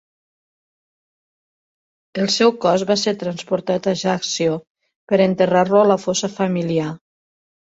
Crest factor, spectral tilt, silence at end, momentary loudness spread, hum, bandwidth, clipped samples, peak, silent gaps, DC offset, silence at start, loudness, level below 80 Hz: 18 dB; -4.5 dB/octave; 0.8 s; 9 LU; none; 8 kHz; under 0.1%; -2 dBFS; 4.67-4.75 s, 4.96-5.07 s; under 0.1%; 2.15 s; -18 LUFS; -62 dBFS